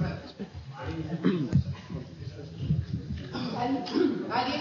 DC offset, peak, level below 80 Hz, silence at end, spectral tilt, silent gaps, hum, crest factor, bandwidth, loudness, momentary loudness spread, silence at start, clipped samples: under 0.1%; -12 dBFS; -48 dBFS; 0 s; -7.5 dB/octave; none; none; 18 dB; 7.2 kHz; -31 LUFS; 14 LU; 0 s; under 0.1%